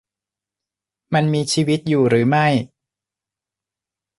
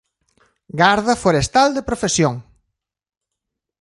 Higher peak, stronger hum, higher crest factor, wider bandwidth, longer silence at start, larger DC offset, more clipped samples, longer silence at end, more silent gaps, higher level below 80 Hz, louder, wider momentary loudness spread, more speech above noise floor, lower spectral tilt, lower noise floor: second, -4 dBFS vs 0 dBFS; neither; about the same, 18 dB vs 20 dB; about the same, 11.5 kHz vs 11.5 kHz; first, 1.1 s vs 0.75 s; neither; neither; first, 1.55 s vs 1.4 s; neither; second, -60 dBFS vs -44 dBFS; about the same, -18 LUFS vs -17 LUFS; about the same, 7 LU vs 8 LU; first, 71 dB vs 65 dB; first, -5.5 dB/octave vs -4 dB/octave; first, -88 dBFS vs -81 dBFS